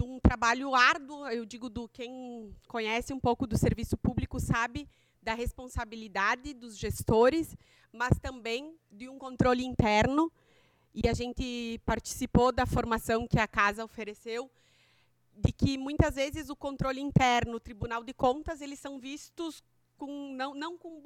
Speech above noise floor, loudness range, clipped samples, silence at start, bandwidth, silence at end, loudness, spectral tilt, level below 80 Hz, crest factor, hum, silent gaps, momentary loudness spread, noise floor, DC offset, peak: 38 dB; 4 LU; under 0.1%; 0 s; 17 kHz; 0.05 s; -30 LUFS; -5.5 dB/octave; -42 dBFS; 24 dB; none; none; 16 LU; -69 dBFS; under 0.1%; -8 dBFS